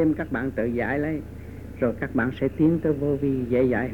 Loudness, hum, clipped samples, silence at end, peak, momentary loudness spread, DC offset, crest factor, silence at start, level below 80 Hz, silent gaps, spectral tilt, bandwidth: -25 LUFS; none; under 0.1%; 0 s; -10 dBFS; 9 LU; under 0.1%; 14 dB; 0 s; -44 dBFS; none; -9.5 dB/octave; 18.5 kHz